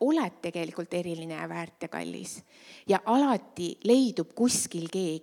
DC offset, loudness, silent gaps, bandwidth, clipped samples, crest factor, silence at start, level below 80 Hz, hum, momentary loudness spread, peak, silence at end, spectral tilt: under 0.1%; -29 LUFS; none; 17 kHz; under 0.1%; 18 dB; 0 s; -74 dBFS; none; 13 LU; -10 dBFS; 0 s; -4.5 dB/octave